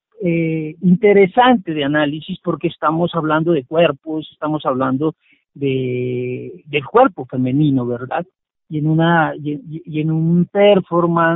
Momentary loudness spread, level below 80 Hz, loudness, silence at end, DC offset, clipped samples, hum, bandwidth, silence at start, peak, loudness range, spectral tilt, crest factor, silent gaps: 12 LU; -56 dBFS; -17 LUFS; 0 s; under 0.1%; under 0.1%; none; 4 kHz; 0.2 s; -2 dBFS; 4 LU; -5.5 dB/octave; 16 dB; none